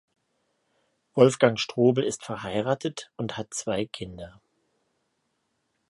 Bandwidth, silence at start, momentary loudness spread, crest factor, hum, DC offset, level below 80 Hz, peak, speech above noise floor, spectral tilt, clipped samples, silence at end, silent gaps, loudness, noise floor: 11.5 kHz; 1.15 s; 16 LU; 26 dB; none; under 0.1%; -62 dBFS; -2 dBFS; 50 dB; -5 dB/octave; under 0.1%; 1.6 s; none; -26 LUFS; -75 dBFS